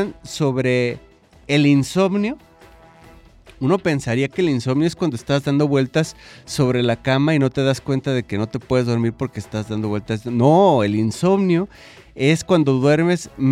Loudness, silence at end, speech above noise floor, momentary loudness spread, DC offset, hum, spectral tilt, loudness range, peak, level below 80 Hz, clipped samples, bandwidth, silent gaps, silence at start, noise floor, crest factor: -19 LUFS; 0 s; 28 dB; 10 LU; under 0.1%; none; -6.5 dB/octave; 4 LU; -2 dBFS; -50 dBFS; under 0.1%; 14.5 kHz; none; 0 s; -47 dBFS; 16 dB